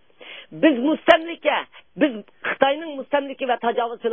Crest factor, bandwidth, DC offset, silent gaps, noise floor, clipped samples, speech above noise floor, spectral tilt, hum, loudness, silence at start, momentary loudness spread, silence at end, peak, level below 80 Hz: 22 dB; 8 kHz; 0.2%; none; -43 dBFS; under 0.1%; 22 dB; -6 dB/octave; none; -21 LUFS; 0.2 s; 15 LU; 0 s; 0 dBFS; -66 dBFS